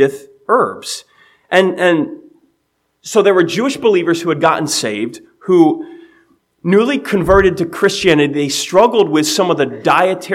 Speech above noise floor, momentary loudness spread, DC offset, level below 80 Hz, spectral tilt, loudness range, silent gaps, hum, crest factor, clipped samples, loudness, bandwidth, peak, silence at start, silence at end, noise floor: 53 dB; 13 LU; under 0.1%; -40 dBFS; -4.5 dB/octave; 3 LU; none; none; 14 dB; under 0.1%; -13 LUFS; 15.5 kHz; 0 dBFS; 0 s; 0 s; -66 dBFS